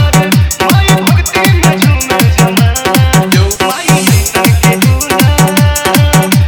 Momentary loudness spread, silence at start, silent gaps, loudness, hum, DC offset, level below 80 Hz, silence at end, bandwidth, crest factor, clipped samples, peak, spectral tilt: 2 LU; 0 s; none; -8 LUFS; none; under 0.1%; -18 dBFS; 0 s; over 20 kHz; 8 dB; 1%; 0 dBFS; -4.5 dB/octave